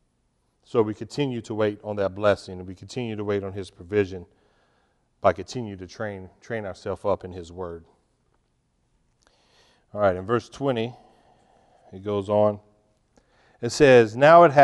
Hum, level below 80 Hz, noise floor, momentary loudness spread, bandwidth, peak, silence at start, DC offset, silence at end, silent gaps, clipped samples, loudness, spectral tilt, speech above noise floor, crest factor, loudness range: none; -58 dBFS; -70 dBFS; 21 LU; 11.5 kHz; -2 dBFS; 0.75 s; under 0.1%; 0 s; none; under 0.1%; -23 LUFS; -6 dB/octave; 47 dB; 22 dB; 10 LU